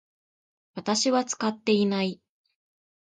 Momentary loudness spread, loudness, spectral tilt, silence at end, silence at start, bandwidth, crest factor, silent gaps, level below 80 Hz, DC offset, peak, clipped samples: 14 LU; -26 LUFS; -4 dB/octave; 0.9 s; 0.75 s; 9.4 kHz; 18 dB; none; -74 dBFS; under 0.1%; -10 dBFS; under 0.1%